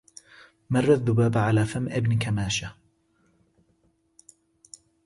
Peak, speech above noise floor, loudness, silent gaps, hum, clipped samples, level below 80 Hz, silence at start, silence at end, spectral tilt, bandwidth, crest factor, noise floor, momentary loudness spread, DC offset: -8 dBFS; 44 dB; -24 LUFS; none; none; under 0.1%; -52 dBFS; 0.7 s; 2.35 s; -6 dB/octave; 11.5 kHz; 18 dB; -67 dBFS; 7 LU; under 0.1%